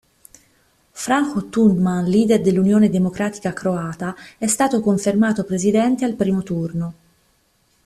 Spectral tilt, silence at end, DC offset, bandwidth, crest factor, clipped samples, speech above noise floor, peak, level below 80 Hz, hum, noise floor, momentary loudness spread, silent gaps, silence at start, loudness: -6 dB/octave; 0.95 s; under 0.1%; 14 kHz; 16 dB; under 0.1%; 44 dB; -4 dBFS; -54 dBFS; none; -62 dBFS; 10 LU; none; 0.95 s; -19 LUFS